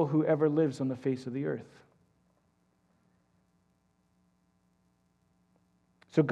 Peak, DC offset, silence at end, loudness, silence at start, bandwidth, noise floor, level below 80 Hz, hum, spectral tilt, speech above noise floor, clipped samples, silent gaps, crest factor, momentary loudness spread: -12 dBFS; under 0.1%; 0 s; -31 LUFS; 0 s; 9.6 kHz; -72 dBFS; -80 dBFS; none; -8.5 dB/octave; 42 dB; under 0.1%; none; 22 dB; 9 LU